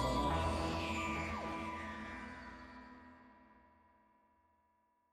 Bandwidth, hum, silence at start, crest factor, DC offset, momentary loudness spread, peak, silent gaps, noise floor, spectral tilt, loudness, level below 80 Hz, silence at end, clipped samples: 13.5 kHz; none; 0 s; 18 dB; under 0.1%; 21 LU; -24 dBFS; none; -77 dBFS; -5.5 dB/octave; -40 LUFS; -52 dBFS; 1.55 s; under 0.1%